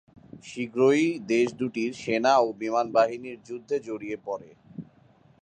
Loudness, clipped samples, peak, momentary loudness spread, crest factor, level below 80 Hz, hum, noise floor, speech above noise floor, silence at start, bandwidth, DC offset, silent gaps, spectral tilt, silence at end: -26 LUFS; under 0.1%; -8 dBFS; 21 LU; 18 dB; -70 dBFS; none; -58 dBFS; 33 dB; 0.35 s; 9.4 kHz; under 0.1%; none; -5 dB/octave; 0.6 s